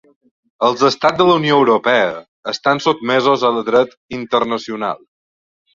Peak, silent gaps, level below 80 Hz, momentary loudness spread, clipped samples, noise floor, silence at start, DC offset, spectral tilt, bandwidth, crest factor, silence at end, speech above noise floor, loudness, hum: 0 dBFS; 2.28-2.43 s, 3.97-4.09 s; -58 dBFS; 11 LU; under 0.1%; under -90 dBFS; 0.6 s; under 0.1%; -5 dB/octave; 7.6 kHz; 16 dB; 0.75 s; over 75 dB; -15 LUFS; none